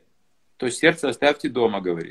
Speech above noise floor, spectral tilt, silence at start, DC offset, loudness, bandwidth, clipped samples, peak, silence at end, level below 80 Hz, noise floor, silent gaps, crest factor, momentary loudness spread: 49 dB; -4 dB/octave; 0.6 s; under 0.1%; -22 LUFS; 12.5 kHz; under 0.1%; -2 dBFS; 0 s; -60 dBFS; -71 dBFS; none; 22 dB; 8 LU